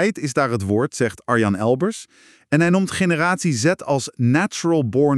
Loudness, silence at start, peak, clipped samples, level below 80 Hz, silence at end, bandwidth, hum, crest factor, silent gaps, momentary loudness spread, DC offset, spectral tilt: -19 LUFS; 0 s; -4 dBFS; under 0.1%; -58 dBFS; 0 s; 13 kHz; none; 16 dB; none; 4 LU; under 0.1%; -5.5 dB/octave